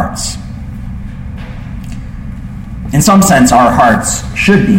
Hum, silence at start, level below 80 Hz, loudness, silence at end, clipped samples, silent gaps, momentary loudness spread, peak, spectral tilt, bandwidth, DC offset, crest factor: none; 0 s; -26 dBFS; -9 LUFS; 0 s; under 0.1%; none; 19 LU; 0 dBFS; -5 dB/octave; 17 kHz; under 0.1%; 12 dB